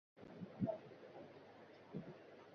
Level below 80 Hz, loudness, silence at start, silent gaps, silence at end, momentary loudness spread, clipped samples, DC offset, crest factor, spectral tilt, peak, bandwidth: -78 dBFS; -51 LUFS; 0.15 s; none; 0 s; 16 LU; under 0.1%; under 0.1%; 24 dB; -7.5 dB/octave; -28 dBFS; 6.6 kHz